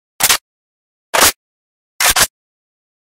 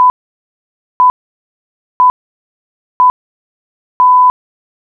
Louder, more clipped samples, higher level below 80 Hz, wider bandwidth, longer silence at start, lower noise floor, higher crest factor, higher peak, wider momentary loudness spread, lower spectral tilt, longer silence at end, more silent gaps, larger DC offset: about the same, -13 LUFS vs -11 LUFS; neither; first, -42 dBFS vs -56 dBFS; first, over 20 kHz vs 2.4 kHz; first, 0.2 s vs 0 s; about the same, under -90 dBFS vs under -90 dBFS; first, 18 dB vs 12 dB; first, 0 dBFS vs -4 dBFS; about the same, 5 LU vs 5 LU; about the same, 0.5 dB/octave vs 1.5 dB/octave; first, 0.85 s vs 0.7 s; second, 0.41-1.13 s, 1.36-1.99 s vs 0.10-1.00 s, 1.10-2.00 s, 2.10-3.00 s, 3.10-4.00 s; neither